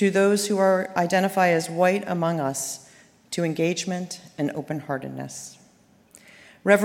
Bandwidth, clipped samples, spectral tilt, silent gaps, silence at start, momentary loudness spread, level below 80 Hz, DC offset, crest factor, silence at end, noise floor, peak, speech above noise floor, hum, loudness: 16.5 kHz; under 0.1%; -5 dB/octave; none; 0 s; 14 LU; -70 dBFS; under 0.1%; 20 dB; 0 s; -57 dBFS; -4 dBFS; 34 dB; none; -24 LUFS